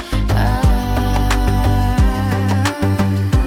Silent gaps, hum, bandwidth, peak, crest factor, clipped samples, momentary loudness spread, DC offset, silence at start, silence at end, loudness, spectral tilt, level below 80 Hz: none; none; 16.5 kHz; -4 dBFS; 10 dB; under 0.1%; 2 LU; under 0.1%; 0 s; 0 s; -17 LUFS; -6.5 dB/octave; -18 dBFS